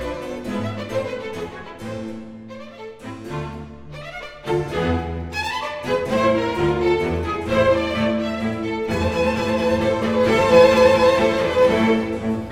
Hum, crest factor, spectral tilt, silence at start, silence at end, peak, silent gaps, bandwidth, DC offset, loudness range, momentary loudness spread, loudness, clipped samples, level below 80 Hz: none; 18 dB; -6 dB/octave; 0 s; 0 s; -2 dBFS; none; 14 kHz; under 0.1%; 14 LU; 19 LU; -20 LUFS; under 0.1%; -42 dBFS